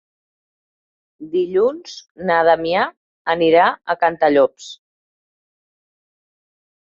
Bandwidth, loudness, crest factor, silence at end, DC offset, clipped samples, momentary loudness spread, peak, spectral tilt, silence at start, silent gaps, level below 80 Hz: 7.6 kHz; -17 LUFS; 18 dB; 2.2 s; under 0.1%; under 0.1%; 16 LU; -2 dBFS; -5 dB/octave; 1.2 s; 2.11-2.15 s, 2.97-3.25 s; -62 dBFS